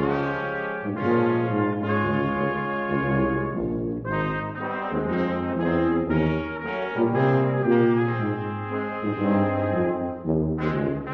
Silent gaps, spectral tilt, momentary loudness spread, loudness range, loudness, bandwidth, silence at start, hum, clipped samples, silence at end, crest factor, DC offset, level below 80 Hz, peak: none; -10 dB/octave; 7 LU; 3 LU; -25 LUFS; 6 kHz; 0 s; none; under 0.1%; 0 s; 14 dB; under 0.1%; -44 dBFS; -10 dBFS